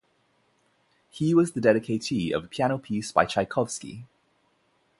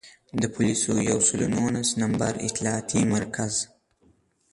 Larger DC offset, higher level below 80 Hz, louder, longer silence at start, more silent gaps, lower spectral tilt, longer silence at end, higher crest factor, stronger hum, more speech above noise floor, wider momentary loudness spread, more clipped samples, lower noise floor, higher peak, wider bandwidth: neither; second, -60 dBFS vs -54 dBFS; about the same, -26 LUFS vs -25 LUFS; first, 1.15 s vs 0.05 s; neither; first, -5.5 dB/octave vs -4 dB/octave; about the same, 0.95 s vs 0.85 s; first, 24 dB vs 18 dB; neither; first, 43 dB vs 38 dB; about the same, 9 LU vs 8 LU; neither; first, -68 dBFS vs -63 dBFS; first, -4 dBFS vs -8 dBFS; about the same, 11.5 kHz vs 11.5 kHz